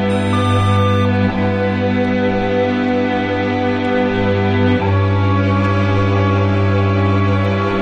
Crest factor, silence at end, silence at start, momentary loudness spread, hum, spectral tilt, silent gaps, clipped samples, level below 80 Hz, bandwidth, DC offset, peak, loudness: 12 dB; 0 s; 0 s; 2 LU; none; -8 dB/octave; none; under 0.1%; -38 dBFS; 9.4 kHz; under 0.1%; -2 dBFS; -15 LUFS